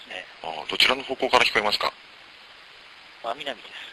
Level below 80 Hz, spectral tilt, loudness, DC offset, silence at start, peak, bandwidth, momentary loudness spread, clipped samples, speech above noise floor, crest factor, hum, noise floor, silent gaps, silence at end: -58 dBFS; -1.5 dB/octave; -23 LUFS; under 0.1%; 0 s; -4 dBFS; 12.5 kHz; 16 LU; under 0.1%; 23 dB; 22 dB; none; -48 dBFS; none; 0 s